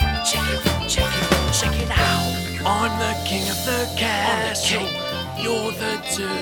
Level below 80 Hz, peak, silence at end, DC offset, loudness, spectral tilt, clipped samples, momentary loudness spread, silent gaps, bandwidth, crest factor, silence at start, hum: -32 dBFS; -2 dBFS; 0 s; under 0.1%; -21 LUFS; -3.5 dB/octave; under 0.1%; 5 LU; none; over 20 kHz; 20 dB; 0 s; none